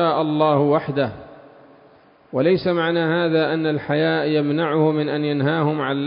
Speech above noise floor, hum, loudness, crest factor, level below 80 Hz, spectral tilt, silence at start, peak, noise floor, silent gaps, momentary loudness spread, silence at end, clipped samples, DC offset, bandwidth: 32 dB; none; -20 LUFS; 16 dB; -60 dBFS; -11.5 dB/octave; 0 s; -4 dBFS; -51 dBFS; none; 4 LU; 0 s; under 0.1%; under 0.1%; 5.4 kHz